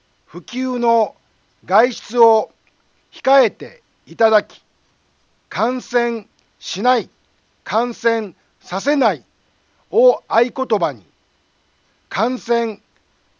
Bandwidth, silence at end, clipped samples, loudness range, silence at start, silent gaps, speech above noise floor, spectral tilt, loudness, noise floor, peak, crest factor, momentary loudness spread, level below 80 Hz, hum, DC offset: 7.4 kHz; 0.65 s; under 0.1%; 4 LU; 0.35 s; none; 45 dB; -4.5 dB/octave; -18 LUFS; -62 dBFS; 0 dBFS; 18 dB; 18 LU; -70 dBFS; none; under 0.1%